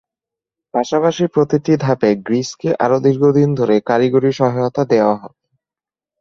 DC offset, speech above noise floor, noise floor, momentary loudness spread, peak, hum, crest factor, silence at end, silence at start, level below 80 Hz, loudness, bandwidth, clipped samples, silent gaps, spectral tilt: under 0.1%; over 75 dB; under -90 dBFS; 6 LU; -2 dBFS; none; 14 dB; 0.95 s; 0.75 s; -56 dBFS; -16 LUFS; 7.6 kHz; under 0.1%; none; -7 dB/octave